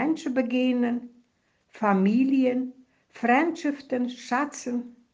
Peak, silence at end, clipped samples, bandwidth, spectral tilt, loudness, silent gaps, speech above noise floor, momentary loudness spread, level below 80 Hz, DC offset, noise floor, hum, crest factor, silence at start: -10 dBFS; 0.2 s; under 0.1%; 7.8 kHz; -6 dB/octave; -26 LUFS; none; 45 dB; 10 LU; -74 dBFS; under 0.1%; -69 dBFS; none; 16 dB; 0 s